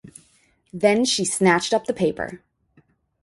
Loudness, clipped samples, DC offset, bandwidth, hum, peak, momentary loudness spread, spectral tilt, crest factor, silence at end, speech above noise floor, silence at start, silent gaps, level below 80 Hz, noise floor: -21 LUFS; under 0.1%; under 0.1%; 11.5 kHz; none; -4 dBFS; 14 LU; -3.5 dB/octave; 20 dB; 0.85 s; 41 dB; 0.75 s; none; -58 dBFS; -61 dBFS